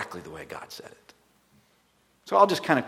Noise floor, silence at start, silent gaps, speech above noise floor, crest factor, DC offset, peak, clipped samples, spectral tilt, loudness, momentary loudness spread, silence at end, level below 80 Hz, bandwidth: -66 dBFS; 0 s; none; 40 dB; 24 dB; under 0.1%; -4 dBFS; under 0.1%; -5 dB/octave; -23 LUFS; 21 LU; 0 s; -68 dBFS; 15.5 kHz